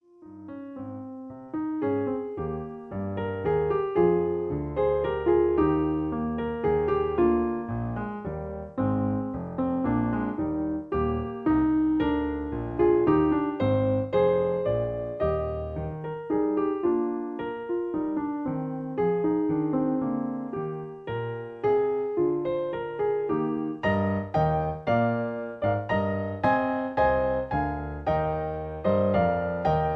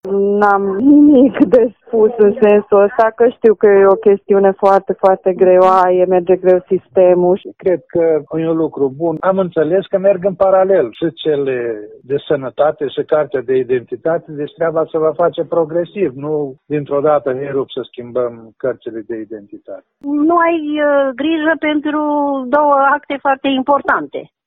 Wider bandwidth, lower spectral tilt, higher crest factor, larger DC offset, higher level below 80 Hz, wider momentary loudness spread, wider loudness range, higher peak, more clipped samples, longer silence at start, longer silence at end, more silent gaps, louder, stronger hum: about the same, 5.2 kHz vs 5.2 kHz; first, -10 dB/octave vs -8.5 dB/octave; about the same, 16 dB vs 14 dB; neither; first, -46 dBFS vs -56 dBFS; about the same, 10 LU vs 12 LU; second, 4 LU vs 8 LU; second, -10 dBFS vs 0 dBFS; neither; first, 0.2 s vs 0.05 s; second, 0 s vs 0.25 s; neither; second, -27 LUFS vs -14 LUFS; neither